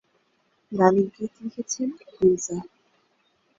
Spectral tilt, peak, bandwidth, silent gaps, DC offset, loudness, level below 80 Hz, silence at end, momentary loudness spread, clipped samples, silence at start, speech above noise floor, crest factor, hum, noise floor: -5.5 dB/octave; -4 dBFS; 7.8 kHz; none; under 0.1%; -25 LUFS; -64 dBFS; 0.9 s; 15 LU; under 0.1%; 0.7 s; 45 dB; 22 dB; none; -68 dBFS